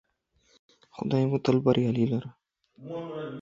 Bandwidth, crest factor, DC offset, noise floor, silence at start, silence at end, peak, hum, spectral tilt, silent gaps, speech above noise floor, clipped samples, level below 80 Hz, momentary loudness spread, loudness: 7.4 kHz; 20 dB; under 0.1%; -69 dBFS; 0.95 s; 0 s; -8 dBFS; none; -8.5 dB/octave; none; 42 dB; under 0.1%; -64 dBFS; 16 LU; -27 LUFS